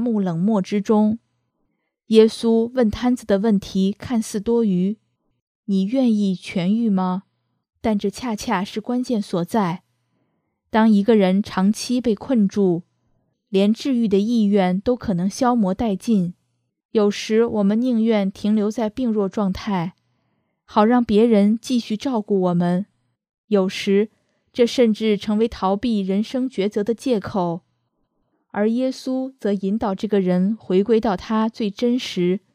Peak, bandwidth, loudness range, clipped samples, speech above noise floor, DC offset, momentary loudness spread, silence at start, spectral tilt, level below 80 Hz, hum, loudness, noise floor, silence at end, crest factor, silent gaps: 0 dBFS; 13.5 kHz; 4 LU; under 0.1%; 53 dB; under 0.1%; 8 LU; 0 s; -7 dB/octave; -52 dBFS; none; -20 LUFS; -72 dBFS; 0.15 s; 20 dB; 5.42-5.63 s, 16.85-16.89 s, 23.38-23.48 s